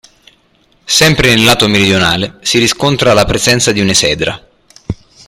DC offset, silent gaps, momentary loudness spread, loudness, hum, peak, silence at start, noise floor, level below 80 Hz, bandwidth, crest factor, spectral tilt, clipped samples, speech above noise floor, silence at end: under 0.1%; none; 11 LU; -9 LUFS; none; 0 dBFS; 0.85 s; -52 dBFS; -34 dBFS; over 20 kHz; 12 dB; -3.5 dB/octave; under 0.1%; 42 dB; 0.35 s